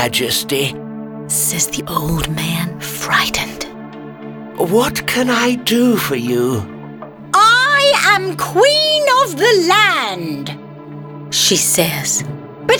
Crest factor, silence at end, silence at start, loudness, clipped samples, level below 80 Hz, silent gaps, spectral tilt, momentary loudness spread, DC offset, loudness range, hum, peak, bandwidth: 16 dB; 0 s; 0 s; -14 LUFS; under 0.1%; -42 dBFS; none; -2.5 dB/octave; 20 LU; under 0.1%; 6 LU; none; 0 dBFS; over 20 kHz